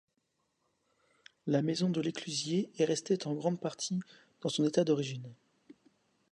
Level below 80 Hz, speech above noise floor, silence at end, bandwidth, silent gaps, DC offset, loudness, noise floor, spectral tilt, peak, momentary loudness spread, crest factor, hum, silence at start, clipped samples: -80 dBFS; 47 dB; 0.95 s; 11 kHz; none; under 0.1%; -33 LUFS; -80 dBFS; -5.5 dB/octave; -14 dBFS; 10 LU; 20 dB; none; 1.45 s; under 0.1%